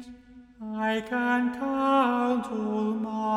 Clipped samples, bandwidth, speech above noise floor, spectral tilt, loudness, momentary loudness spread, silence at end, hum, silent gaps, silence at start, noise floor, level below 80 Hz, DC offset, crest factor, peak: under 0.1%; 12.5 kHz; 23 dB; -6 dB/octave; -27 LUFS; 10 LU; 0 s; none; none; 0 s; -49 dBFS; -62 dBFS; under 0.1%; 14 dB; -14 dBFS